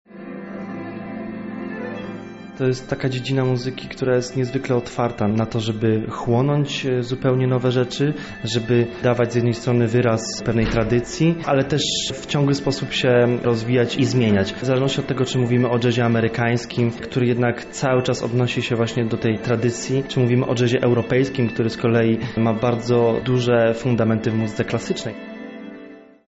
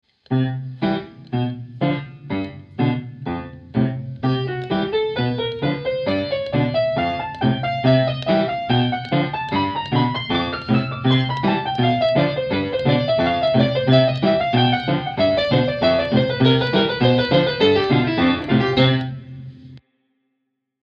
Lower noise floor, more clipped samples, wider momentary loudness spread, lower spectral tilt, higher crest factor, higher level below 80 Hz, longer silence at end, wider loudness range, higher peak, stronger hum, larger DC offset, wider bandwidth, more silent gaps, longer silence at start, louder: second, -42 dBFS vs -75 dBFS; neither; first, 12 LU vs 9 LU; second, -6 dB/octave vs -8.5 dB/octave; second, 12 dB vs 18 dB; about the same, -46 dBFS vs -48 dBFS; second, 0.3 s vs 1.1 s; second, 3 LU vs 7 LU; second, -8 dBFS vs -2 dBFS; neither; neither; first, 8 kHz vs 6.4 kHz; neither; second, 0.1 s vs 0.3 s; about the same, -20 LUFS vs -20 LUFS